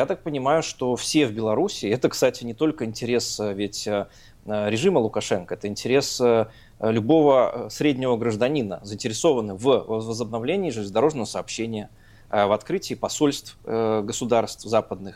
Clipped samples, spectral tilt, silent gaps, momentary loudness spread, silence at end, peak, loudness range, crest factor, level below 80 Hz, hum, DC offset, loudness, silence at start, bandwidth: under 0.1%; -5 dB/octave; none; 9 LU; 0 s; -6 dBFS; 4 LU; 18 dB; -54 dBFS; none; under 0.1%; -23 LUFS; 0 s; 16 kHz